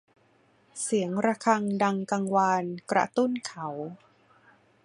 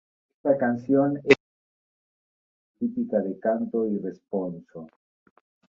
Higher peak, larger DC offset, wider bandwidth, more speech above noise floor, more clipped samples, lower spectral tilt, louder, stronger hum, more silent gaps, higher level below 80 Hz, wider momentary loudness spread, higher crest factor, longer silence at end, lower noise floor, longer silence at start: second, -8 dBFS vs -2 dBFS; neither; first, 11.5 kHz vs 7.6 kHz; second, 37 dB vs over 65 dB; neither; second, -5 dB/octave vs -7 dB/octave; about the same, -27 LUFS vs -25 LUFS; neither; second, none vs 1.40-2.74 s; second, -74 dBFS vs -68 dBFS; about the same, 11 LU vs 12 LU; second, 20 dB vs 26 dB; about the same, 0.9 s vs 0.9 s; second, -64 dBFS vs under -90 dBFS; first, 0.75 s vs 0.45 s